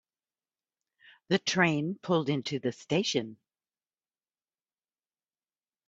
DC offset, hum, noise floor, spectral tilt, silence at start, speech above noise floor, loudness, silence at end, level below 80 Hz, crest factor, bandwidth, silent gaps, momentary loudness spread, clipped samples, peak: under 0.1%; none; under -90 dBFS; -4.5 dB/octave; 1.3 s; over 61 dB; -29 LUFS; 2.55 s; -72 dBFS; 24 dB; 8 kHz; none; 8 LU; under 0.1%; -10 dBFS